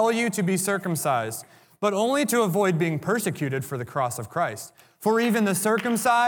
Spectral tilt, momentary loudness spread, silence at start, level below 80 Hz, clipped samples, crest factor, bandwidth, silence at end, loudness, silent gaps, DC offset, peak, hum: -4.5 dB/octave; 8 LU; 0 s; -72 dBFS; under 0.1%; 16 dB; 19.5 kHz; 0 s; -24 LUFS; none; under 0.1%; -8 dBFS; none